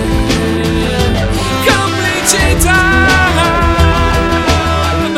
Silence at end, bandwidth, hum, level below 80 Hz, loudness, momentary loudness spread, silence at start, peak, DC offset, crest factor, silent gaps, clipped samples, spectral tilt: 0 s; 16.5 kHz; none; -18 dBFS; -11 LUFS; 5 LU; 0 s; 0 dBFS; under 0.1%; 10 dB; none; 0.1%; -4 dB/octave